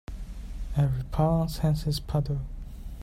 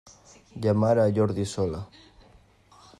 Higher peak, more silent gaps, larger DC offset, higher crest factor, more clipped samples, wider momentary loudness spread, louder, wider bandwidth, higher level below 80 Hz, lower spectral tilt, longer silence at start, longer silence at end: second, -14 dBFS vs -10 dBFS; neither; neither; about the same, 14 dB vs 18 dB; neither; second, 16 LU vs 19 LU; second, -28 LUFS vs -25 LUFS; first, 15.5 kHz vs 11 kHz; first, -36 dBFS vs -56 dBFS; about the same, -7.5 dB/octave vs -7.5 dB/octave; second, 0.1 s vs 0.55 s; second, 0 s vs 1.15 s